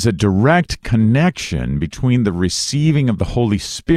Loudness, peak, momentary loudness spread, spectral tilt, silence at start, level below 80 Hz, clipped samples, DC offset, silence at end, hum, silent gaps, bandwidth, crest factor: -16 LUFS; -2 dBFS; 7 LU; -6 dB/octave; 0 s; -32 dBFS; under 0.1%; under 0.1%; 0 s; none; none; 14 kHz; 14 dB